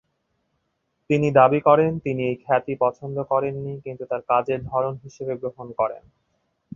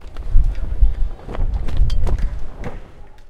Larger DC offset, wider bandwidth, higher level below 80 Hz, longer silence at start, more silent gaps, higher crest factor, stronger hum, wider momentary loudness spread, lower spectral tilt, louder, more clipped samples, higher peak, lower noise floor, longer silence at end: neither; first, 7.4 kHz vs 5.4 kHz; second, -58 dBFS vs -18 dBFS; first, 1.1 s vs 0 s; neither; first, 22 dB vs 16 dB; neither; first, 15 LU vs 12 LU; about the same, -8 dB/octave vs -7.5 dB/octave; about the same, -22 LUFS vs -24 LUFS; neither; about the same, -2 dBFS vs 0 dBFS; first, -74 dBFS vs -35 dBFS; first, 0.8 s vs 0.05 s